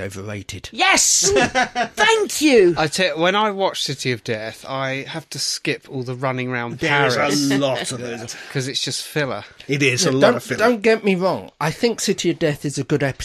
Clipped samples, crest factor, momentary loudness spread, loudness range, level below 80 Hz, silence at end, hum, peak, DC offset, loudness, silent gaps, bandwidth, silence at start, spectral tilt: under 0.1%; 18 dB; 13 LU; 6 LU; -52 dBFS; 0 s; none; 0 dBFS; under 0.1%; -19 LUFS; none; 14 kHz; 0 s; -3.5 dB/octave